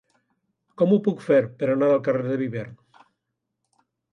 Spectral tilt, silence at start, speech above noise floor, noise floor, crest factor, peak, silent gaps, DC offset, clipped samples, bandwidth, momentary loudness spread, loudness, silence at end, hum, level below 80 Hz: -9 dB/octave; 0.8 s; 59 dB; -80 dBFS; 18 dB; -8 dBFS; none; under 0.1%; under 0.1%; 9.2 kHz; 10 LU; -22 LUFS; 1.4 s; none; -70 dBFS